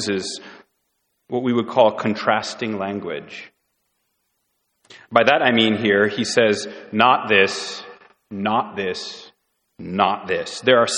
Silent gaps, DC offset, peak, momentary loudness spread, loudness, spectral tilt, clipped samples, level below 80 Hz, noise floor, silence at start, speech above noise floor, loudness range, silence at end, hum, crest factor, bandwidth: none; under 0.1%; 0 dBFS; 16 LU; -19 LUFS; -4 dB/octave; under 0.1%; -64 dBFS; -72 dBFS; 0 s; 52 dB; 7 LU; 0 s; none; 22 dB; 11 kHz